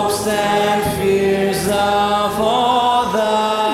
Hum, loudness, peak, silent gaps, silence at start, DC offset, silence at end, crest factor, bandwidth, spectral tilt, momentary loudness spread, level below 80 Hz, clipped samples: none; -16 LUFS; -2 dBFS; none; 0 s; under 0.1%; 0 s; 14 dB; 16.5 kHz; -4 dB/octave; 2 LU; -44 dBFS; under 0.1%